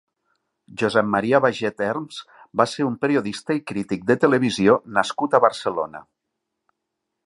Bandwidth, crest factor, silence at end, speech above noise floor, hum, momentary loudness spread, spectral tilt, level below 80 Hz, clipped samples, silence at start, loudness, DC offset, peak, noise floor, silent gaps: 11.5 kHz; 22 dB; 1.25 s; 59 dB; none; 11 LU; -5.5 dB/octave; -62 dBFS; under 0.1%; 0.7 s; -21 LUFS; under 0.1%; -2 dBFS; -80 dBFS; none